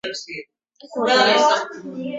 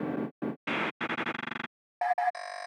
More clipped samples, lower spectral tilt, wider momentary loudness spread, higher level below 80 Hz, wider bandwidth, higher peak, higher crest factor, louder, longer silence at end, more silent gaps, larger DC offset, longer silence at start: neither; second, -2.5 dB/octave vs -5 dB/octave; first, 19 LU vs 8 LU; first, -68 dBFS vs -82 dBFS; second, 8 kHz vs 10.5 kHz; first, -4 dBFS vs -18 dBFS; about the same, 18 dB vs 16 dB; first, -17 LUFS vs -33 LUFS; about the same, 0 s vs 0 s; second, none vs 0.31-0.42 s, 0.56-0.67 s, 0.91-1.00 s, 1.67-2.01 s, 2.30-2.34 s; neither; about the same, 0.05 s vs 0 s